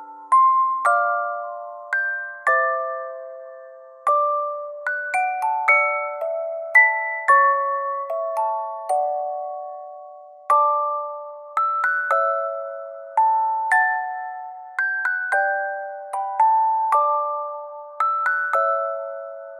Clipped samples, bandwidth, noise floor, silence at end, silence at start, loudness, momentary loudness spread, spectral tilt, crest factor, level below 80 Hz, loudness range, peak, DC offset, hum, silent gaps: under 0.1%; 14 kHz; -42 dBFS; 0 s; 0 s; -21 LUFS; 16 LU; -0.5 dB/octave; 18 dB; under -90 dBFS; 5 LU; -4 dBFS; under 0.1%; none; none